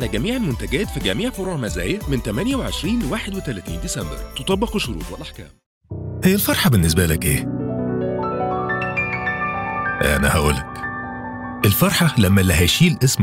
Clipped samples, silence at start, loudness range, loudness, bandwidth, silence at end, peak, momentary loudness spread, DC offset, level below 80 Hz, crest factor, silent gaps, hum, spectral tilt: under 0.1%; 0 s; 6 LU; -20 LUFS; 17 kHz; 0 s; -4 dBFS; 12 LU; under 0.1%; -34 dBFS; 16 dB; 5.66-5.81 s; none; -4.5 dB/octave